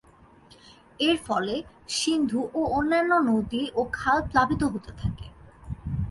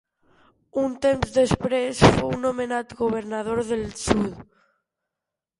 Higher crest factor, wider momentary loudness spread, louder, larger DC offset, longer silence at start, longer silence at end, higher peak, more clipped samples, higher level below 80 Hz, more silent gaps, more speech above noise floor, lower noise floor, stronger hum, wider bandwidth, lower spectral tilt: second, 18 dB vs 24 dB; about the same, 11 LU vs 10 LU; second, -26 LUFS vs -23 LUFS; neither; first, 1 s vs 0.75 s; second, 0 s vs 1.15 s; second, -8 dBFS vs 0 dBFS; neither; about the same, -44 dBFS vs -42 dBFS; neither; second, 29 dB vs 64 dB; second, -54 dBFS vs -87 dBFS; neither; about the same, 11.5 kHz vs 11.5 kHz; about the same, -5 dB/octave vs -5.5 dB/octave